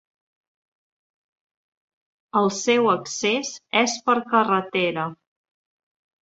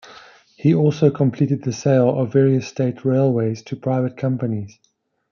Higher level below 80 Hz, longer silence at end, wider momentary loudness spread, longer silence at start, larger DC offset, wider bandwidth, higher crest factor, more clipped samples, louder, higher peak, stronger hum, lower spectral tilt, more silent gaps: second, -72 dBFS vs -64 dBFS; first, 1.05 s vs 0.65 s; about the same, 6 LU vs 8 LU; first, 2.35 s vs 0.1 s; neither; first, 8.2 kHz vs 7 kHz; first, 22 dB vs 16 dB; neither; second, -22 LUFS vs -19 LUFS; about the same, -4 dBFS vs -4 dBFS; neither; second, -3.5 dB/octave vs -8 dB/octave; neither